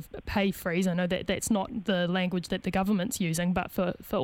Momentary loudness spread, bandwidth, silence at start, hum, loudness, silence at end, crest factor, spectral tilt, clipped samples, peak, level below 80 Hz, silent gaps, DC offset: 3 LU; 18.5 kHz; 0 s; none; -29 LUFS; 0 s; 16 dB; -5 dB/octave; under 0.1%; -12 dBFS; -50 dBFS; none; under 0.1%